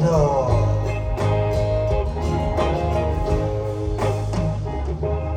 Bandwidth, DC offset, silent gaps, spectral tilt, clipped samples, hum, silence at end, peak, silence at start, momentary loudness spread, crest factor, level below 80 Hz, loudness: 9.6 kHz; under 0.1%; none; -7.5 dB/octave; under 0.1%; none; 0 s; -6 dBFS; 0 s; 6 LU; 14 dB; -28 dBFS; -22 LUFS